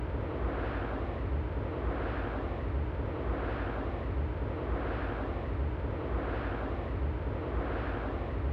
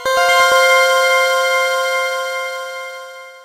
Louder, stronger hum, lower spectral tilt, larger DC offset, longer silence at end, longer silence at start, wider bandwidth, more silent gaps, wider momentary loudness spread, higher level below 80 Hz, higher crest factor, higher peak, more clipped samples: second, -35 LUFS vs -13 LUFS; neither; first, -9.5 dB/octave vs 1.5 dB/octave; neither; about the same, 0 s vs 0.05 s; about the same, 0 s vs 0 s; second, 5.2 kHz vs 16 kHz; neither; second, 1 LU vs 17 LU; first, -36 dBFS vs -58 dBFS; second, 10 dB vs 16 dB; second, -22 dBFS vs 0 dBFS; neither